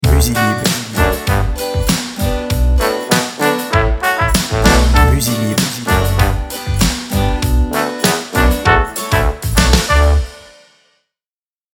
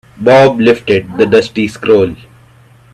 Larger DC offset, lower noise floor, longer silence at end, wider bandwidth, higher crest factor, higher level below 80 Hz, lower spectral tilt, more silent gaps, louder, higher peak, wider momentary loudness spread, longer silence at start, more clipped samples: neither; first, under -90 dBFS vs -42 dBFS; first, 1.35 s vs 0.8 s; first, 19.5 kHz vs 12 kHz; about the same, 14 dB vs 10 dB; first, -18 dBFS vs -46 dBFS; second, -4.5 dB/octave vs -6.5 dB/octave; neither; second, -14 LUFS vs -10 LUFS; about the same, 0 dBFS vs 0 dBFS; second, 6 LU vs 9 LU; second, 0 s vs 0.2 s; neither